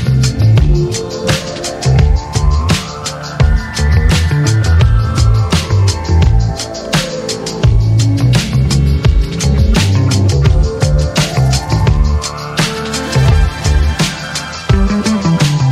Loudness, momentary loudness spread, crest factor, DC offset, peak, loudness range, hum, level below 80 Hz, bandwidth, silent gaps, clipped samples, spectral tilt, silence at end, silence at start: -13 LUFS; 6 LU; 12 dB; under 0.1%; 0 dBFS; 2 LU; none; -16 dBFS; 14 kHz; none; under 0.1%; -5.5 dB/octave; 0 s; 0 s